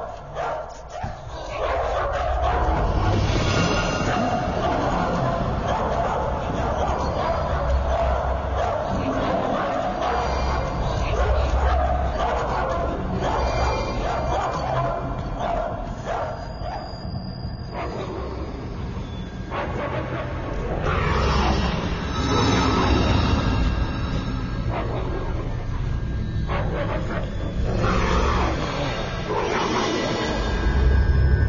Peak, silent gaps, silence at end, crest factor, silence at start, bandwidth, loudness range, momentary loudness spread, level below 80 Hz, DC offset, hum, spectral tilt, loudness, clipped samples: -8 dBFS; none; 0 s; 16 dB; 0 s; 7.4 kHz; 7 LU; 10 LU; -28 dBFS; under 0.1%; none; -6 dB/octave; -24 LUFS; under 0.1%